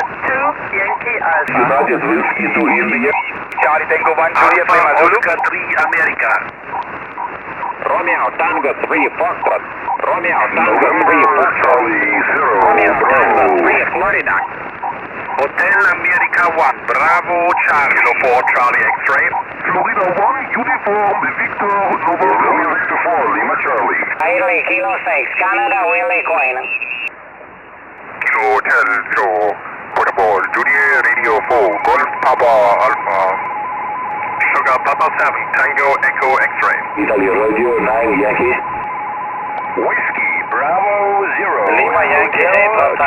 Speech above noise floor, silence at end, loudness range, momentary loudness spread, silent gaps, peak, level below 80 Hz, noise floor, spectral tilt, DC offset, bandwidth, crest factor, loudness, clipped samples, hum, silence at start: 22 dB; 0 s; 4 LU; 10 LU; none; 0 dBFS; -52 dBFS; -35 dBFS; -5.5 dB/octave; under 0.1%; 17 kHz; 14 dB; -13 LUFS; under 0.1%; none; 0 s